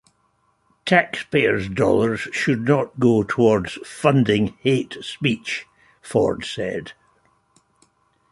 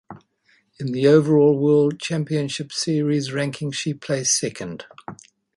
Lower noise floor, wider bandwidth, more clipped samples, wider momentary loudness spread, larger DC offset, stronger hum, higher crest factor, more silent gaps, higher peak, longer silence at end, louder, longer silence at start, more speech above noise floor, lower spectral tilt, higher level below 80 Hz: about the same, -65 dBFS vs -62 dBFS; about the same, 11.5 kHz vs 11.5 kHz; neither; second, 10 LU vs 17 LU; neither; neither; about the same, 20 dB vs 18 dB; neither; about the same, -2 dBFS vs -2 dBFS; first, 1.4 s vs 0.4 s; about the same, -20 LUFS vs -20 LUFS; first, 0.85 s vs 0.1 s; about the same, 45 dB vs 42 dB; about the same, -6 dB/octave vs -5 dB/octave; first, -52 dBFS vs -64 dBFS